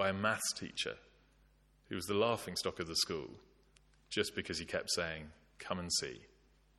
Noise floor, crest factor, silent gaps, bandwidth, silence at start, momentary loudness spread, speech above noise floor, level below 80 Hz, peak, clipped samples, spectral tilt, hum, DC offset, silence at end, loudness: -68 dBFS; 22 dB; none; 14 kHz; 0 s; 14 LU; 30 dB; -66 dBFS; -18 dBFS; under 0.1%; -2.5 dB/octave; none; under 0.1%; 0.55 s; -37 LUFS